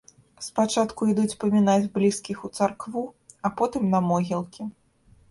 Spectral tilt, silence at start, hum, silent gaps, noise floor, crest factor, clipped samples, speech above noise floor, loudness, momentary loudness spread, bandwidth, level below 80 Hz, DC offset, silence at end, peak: -6 dB/octave; 0.4 s; none; none; -58 dBFS; 16 dB; under 0.1%; 34 dB; -25 LUFS; 13 LU; 11.5 kHz; -60 dBFS; under 0.1%; 0.6 s; -8 dBFS